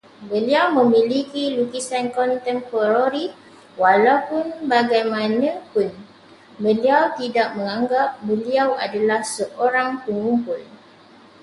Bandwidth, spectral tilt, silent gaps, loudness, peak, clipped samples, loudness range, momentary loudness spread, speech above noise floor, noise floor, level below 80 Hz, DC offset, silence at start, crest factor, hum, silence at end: 11.5 kHz; -4.5 dB/octave; none; -20 LUFS; -2 dBFS; under 0.1%; 2 LU; 9 LU; 28 dB; -48 dBFS; -68 dBFS; under 0.1%; 0.2 s; 18 dB; none; 0.75 s